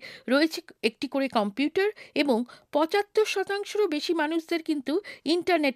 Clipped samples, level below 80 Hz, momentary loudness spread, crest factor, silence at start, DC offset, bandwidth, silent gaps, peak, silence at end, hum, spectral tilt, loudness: under 0.1%; -74 dBFS; 5 LU; 18 dB; 0 s; under 0.1%; 15.5 kHz; none; -8 dBFS; 0 s; none; -4 dB/octave; -27 LUFS